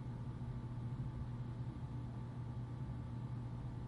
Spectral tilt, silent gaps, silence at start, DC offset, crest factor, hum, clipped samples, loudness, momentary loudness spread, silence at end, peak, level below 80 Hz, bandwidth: -9 dB/octave; none; 0 s; under 0.1%; 10 dB; none; under 0.1%; -46 LUFS; 2 LU; 0 s; -34 dBFS; -54 dBFS; 6.2 kHz